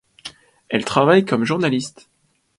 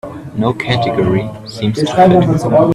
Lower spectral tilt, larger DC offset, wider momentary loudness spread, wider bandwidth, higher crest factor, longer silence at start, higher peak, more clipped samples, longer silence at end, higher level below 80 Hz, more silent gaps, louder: second, -5.5 dB/octave vs -7 dB/octave; neither; first, 22 LU vs 11 LU; second, 11.5 kHz vs 13 kHz; first, 20 dB vs 12 dB; first, 0.25 s vs 0.05 s; about the same, 0 dBFS vs 0 dBFS; neither; first, 0.7 s vs 0 s; second, -60 dBFS vs -42 dBFS; neither; second, -18 LUFS vs -13 LUFS